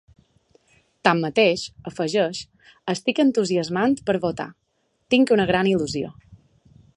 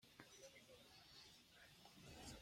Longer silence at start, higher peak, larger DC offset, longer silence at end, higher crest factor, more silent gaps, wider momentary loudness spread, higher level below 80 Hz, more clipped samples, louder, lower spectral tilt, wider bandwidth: first, 1.05 s vs 0 s; first, -2 dBFS vs -42 dBFS; neither; first, 0.6 s vs 0 s; about the same, 22 dB vs 22 dB; neither; first, 15 LU vs 6 LU; first, -56 dBFS vs -76 dBFS; neither; first, -22 LUFS vs -63 LUFS; first, -5 dB/octave vs -3 dB/octave; second, 11 kHz vs 16.5 kHz